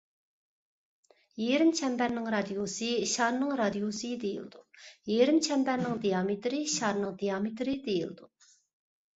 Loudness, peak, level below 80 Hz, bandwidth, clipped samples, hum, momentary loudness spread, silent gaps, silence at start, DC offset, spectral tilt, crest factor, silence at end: -30 LUFS; -12 dBFS; -70 dBFS; 8.4 kHz; under 0.1%; none; 10 LU; none; 1.35 s; under 0.1%; -4 dB/octave; 20 dB; 0.9 s